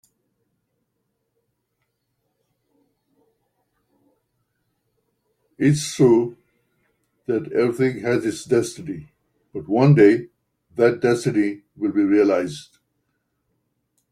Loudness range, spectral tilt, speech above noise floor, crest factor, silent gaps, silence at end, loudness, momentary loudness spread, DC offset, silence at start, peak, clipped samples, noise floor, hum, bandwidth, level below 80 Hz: 6 LU; -6.5 dB/octave; 56 dB; 20 dB; none; 1.5 s; -19 LUFS; 18 LU; under 0.1%; 5.6 s; -2 dBFS; under 0.1%; -75 dBFS; none; 14 kHz; -62 dBFS